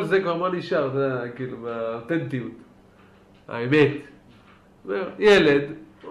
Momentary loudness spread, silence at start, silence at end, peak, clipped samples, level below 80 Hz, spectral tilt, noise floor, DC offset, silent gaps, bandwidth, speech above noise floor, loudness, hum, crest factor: 18 LU; 0 s; 0 s; -6 dBFS; under 0.1%; -58 dBFS; -6.5 dB/octave; -53 dBFS; under 0.1%; none; 11.5 kHz; 30 dB; -23 LUFS; none; 18 dB